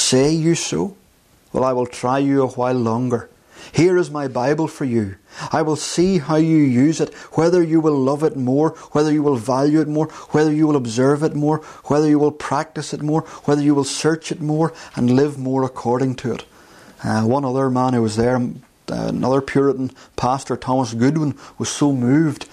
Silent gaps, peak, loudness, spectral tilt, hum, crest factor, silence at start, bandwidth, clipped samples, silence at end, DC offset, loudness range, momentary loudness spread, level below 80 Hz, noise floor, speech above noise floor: none; -4 dBFS; -19 LUFS; -6 dB/octave; none; 14 dB; 0 s; 12.5 kHz; under 0.1%; 0.05 s; under 0.1%; 3 LU; 9 LU; -52 dBFS; -54 dBFS; 36 dB